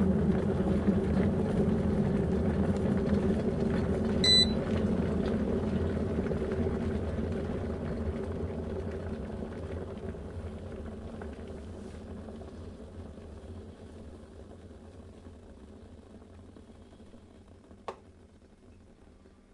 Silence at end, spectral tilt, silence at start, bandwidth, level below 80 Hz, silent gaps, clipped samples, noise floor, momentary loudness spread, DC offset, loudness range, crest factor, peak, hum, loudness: 0.25 s; -6 dB/octave; 0 s; 11 kHz; -44 dBFS; none; under 0.1%; -56 dBFS; 22 LU; under 0.1%; 24 LU; 20 dB; -12 dBFS; none; -30 LUFS